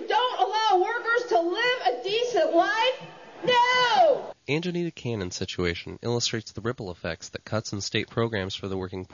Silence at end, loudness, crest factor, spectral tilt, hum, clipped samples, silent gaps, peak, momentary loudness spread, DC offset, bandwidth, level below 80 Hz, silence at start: 0.1 s; -25 LUFS; 16 dB; -4 dB/octave; none; under 0.1%; none; -10 dBFS; 12 LU; under 0.1%; 7.4 kHz; -58 dBFS; 0 s